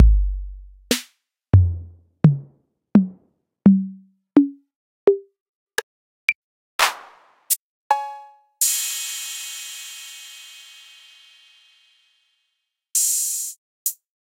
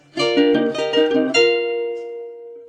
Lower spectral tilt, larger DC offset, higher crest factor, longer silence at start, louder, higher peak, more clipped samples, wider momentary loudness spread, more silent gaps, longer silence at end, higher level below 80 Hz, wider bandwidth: about the same, -4.5 dB/octave vs -4 dB/octave; neither; first, 22 dB vs 16 dB; second, 0 s vs 0.15 s; second, -21 LUFS vs -18 LUFS; first, 0 dBFS vs -4 dBFS; neither; about the same, 18 LU vs 16 LU; first, 4.76-5.07 s, 5.40-5.67 s, 5.83-6.28 s, 6.35-6.79 s, 7.59-7.90 s, 13.58-13.85 s vs none; first, 0.35 s vs 0 s; first, -30 dBFS vs -64 dBFS; first, 16 kHz vs 9.8 kHz